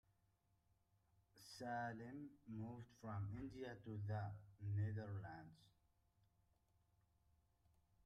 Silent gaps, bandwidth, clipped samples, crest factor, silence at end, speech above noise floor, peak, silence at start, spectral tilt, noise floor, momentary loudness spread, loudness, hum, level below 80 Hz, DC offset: none; 12 kHz; under 0.1%; 16 dB; 2.35 s; 33 dB; -36 dBFS; 1.35 s; -7.5 dB/octave; -82 dBFS; 11 LU; -51 LUFS; none; -76 dBFS; under 0.1%